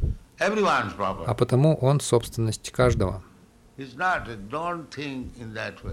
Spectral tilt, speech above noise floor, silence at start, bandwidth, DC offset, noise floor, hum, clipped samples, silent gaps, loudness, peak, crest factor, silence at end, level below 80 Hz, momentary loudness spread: -6 dB/octave; 29 dB; 0 s; 15 kHz; under 0.1%; -54 dBFS; none; under 0.1%; none; -25 LUFS; -6 dBFS; 18 dB; 0 s; -40 dBFS; 13 LU